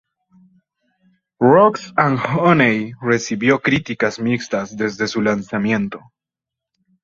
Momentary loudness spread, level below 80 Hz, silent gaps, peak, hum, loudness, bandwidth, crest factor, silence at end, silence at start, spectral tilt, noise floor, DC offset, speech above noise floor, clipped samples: 8 LU; -56 dBFS; none; -2 dBFS; none; -17 LUFS; 7.6 kHz; 18 dB; 1.05 s; 1.4 s; -6 dB/octave; -85 dBFS; under 0.1%; 69 dB; under 0.1%